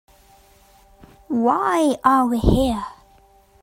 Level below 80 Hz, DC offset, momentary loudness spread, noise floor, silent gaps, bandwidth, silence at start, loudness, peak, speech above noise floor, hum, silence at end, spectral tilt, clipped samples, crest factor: -34 dBFS; under 0.1%; 10 LU; -53 dBFS; none; 16 kHz; 1.3 s; -19 LUFS; -2 dBFS; 35 dB; none; 0.7 s; -6.5 dB/octave; under 0.1%; 20 dB